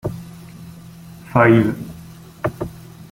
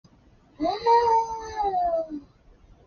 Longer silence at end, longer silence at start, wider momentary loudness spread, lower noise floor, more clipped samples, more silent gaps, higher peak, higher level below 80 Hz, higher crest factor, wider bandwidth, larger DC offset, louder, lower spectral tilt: second, 0.1 s vs 0.65 s; second, 0.05 s vs 0.6 s; first, 26 LU vs 13 LU; second, -39 dBFS vs -57 dBFS; neither; neither; first, -2 dBFS vs -10 dBFS; first, -48 dBFS vs -54 dBFS; about the same, 18 dB vs 16 dB; first, 16.5 kHz vs 6.8 kHz; neither; first, -18 LUFS vs -24 LUFS; first, -8 dB/octave vs -3 dB/octave